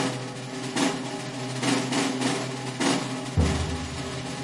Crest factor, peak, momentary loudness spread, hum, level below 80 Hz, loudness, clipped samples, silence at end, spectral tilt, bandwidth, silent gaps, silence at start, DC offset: 16 dB; -10 dBFS; 8 LU; none; -44 dBFS; -28 LUFS; under 0.1%; 0 s; -4.5 dB/octave; 11.5 kHz; none; 0 s; under 0.1%